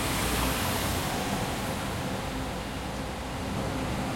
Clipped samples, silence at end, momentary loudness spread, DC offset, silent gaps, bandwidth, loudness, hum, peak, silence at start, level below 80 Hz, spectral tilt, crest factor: under 0.1%; 0 s; 7 LU; under 0.1%; none; 16.5 kHz; -31 LUFS; none; -14 dBFS; 0 s; -40 dBFS; -4 dB/octave; 16 dB